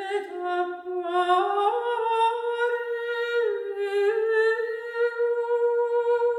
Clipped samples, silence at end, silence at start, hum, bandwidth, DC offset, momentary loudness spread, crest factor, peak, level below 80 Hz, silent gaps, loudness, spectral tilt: under 0.1%; 0 s; 0 s; none; 11 kHz; under 0.1%; 7 LU; 14 dB; -10 dBFS; -80 dBFS; none; -25 LUFS; -2.5 dB/octave